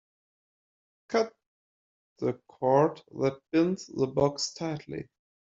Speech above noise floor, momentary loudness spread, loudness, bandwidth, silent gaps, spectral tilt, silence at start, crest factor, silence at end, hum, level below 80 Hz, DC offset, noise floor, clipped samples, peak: over 62 dB; 12 LU; -29 LUFS; 7.8 kHz; 1.46-2.16 s; -5.5 dB/octave; 1.1 s; 20 dB; 0.5 s; none; -64 dBFS; under 0.1%; under -90 dBFS; under 0.1%; -10 dBFS